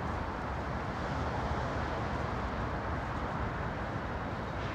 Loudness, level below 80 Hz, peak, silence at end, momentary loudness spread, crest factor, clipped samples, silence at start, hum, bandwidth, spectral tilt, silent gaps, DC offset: -36 LUFS; -44 dBFS; -20 dBFS; 0 s; 2 LU; 14 dB; under 0.1%; 0 s; none; 9.6 kHz; -7 dB/octave; none; under 0.1%